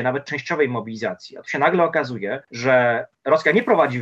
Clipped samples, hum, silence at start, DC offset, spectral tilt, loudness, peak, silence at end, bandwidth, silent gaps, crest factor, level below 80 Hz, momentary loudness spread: under 0.1%; none; 0 s; under 0.1%; -6 dB/octave; -20 LUFS; -4 dBFS; 0 s; 7.8 kHz; none; 16 dB; -70 dBFS; 11 LU